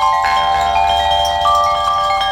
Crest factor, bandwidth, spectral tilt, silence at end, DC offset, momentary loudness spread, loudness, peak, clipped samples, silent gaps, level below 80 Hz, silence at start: 12 dB; 17.5 kHz; -2 dB/octave; 0 s; under 0.1%; 2 LU; -14 LUFS; -2 dBFS; under 0.1%; none; -34 dBFS; 0 s